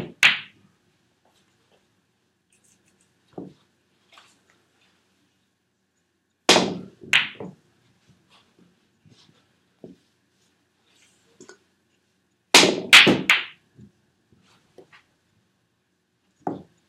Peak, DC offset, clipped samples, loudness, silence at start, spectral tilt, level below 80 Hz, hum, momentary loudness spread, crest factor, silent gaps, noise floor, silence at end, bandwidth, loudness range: 0 dBFS; under 0.1%; under 0.1%; -16 LUFS; 0 s; -1.5 dB/octave; -72 dBFS; none; 30 LU; 26 dB; none; -72 dBFS; 0.3 s; 16 kHz; 11 LU